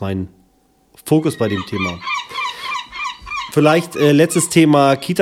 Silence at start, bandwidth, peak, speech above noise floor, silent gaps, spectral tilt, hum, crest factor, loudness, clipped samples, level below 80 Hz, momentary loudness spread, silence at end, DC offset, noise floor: 0 s; 16.5 kHz; 0 dBFS; 42 dB; none; -5 dB/octave; none; 16 dB; -16 LUFS; under 0.1%; -52 dBFS; 13 LU; 0 s; under 0.1%; -57 dBFS